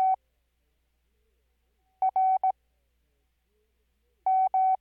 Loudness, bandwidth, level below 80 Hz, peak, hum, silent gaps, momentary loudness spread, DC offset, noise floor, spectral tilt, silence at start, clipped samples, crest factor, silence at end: -27 LUFS; 2.4 kHz; -74 dBFS; -20 dBFS; none; none; 9 LU; under 0.1%; -73 dBFS; -5 dB/octave; 0 s; under 0.1%; 10 dB; 0.05 s